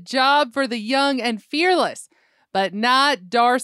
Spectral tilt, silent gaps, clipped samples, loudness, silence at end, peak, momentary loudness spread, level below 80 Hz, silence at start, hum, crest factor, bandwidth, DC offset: -3 dB/octave; none; under 0.1%; -19 LUFS; 0 s; -4 dBFS; 7 LU; -78 dBFS; 0 s; none; 16 dB; 14 kHz; under 0.1%